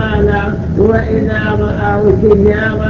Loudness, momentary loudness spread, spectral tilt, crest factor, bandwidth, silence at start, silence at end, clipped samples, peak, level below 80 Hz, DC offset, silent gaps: -12 LUFS; 5 LU; -9 dB/octave; 12 dB; 7 kHz; 0 s; 0 s; under 0.1%; 0 dBFS; -22 dBFS; under 0.1%; none